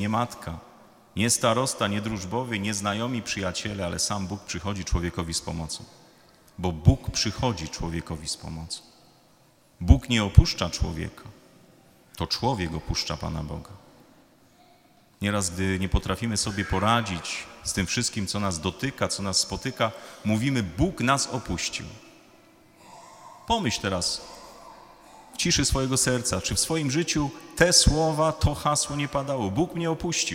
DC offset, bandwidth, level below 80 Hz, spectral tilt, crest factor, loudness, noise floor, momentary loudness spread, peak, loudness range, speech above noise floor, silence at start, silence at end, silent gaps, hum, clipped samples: under 0.1%; 16.5 kHz; -36 dBFS; -4 dB/octave; 26 dB; -26 LUFS; -59 dBFS; 12 LU; 0 dBFS; 8 LU; 33 dB; 0 s; 0 s; none; none; under 0.1%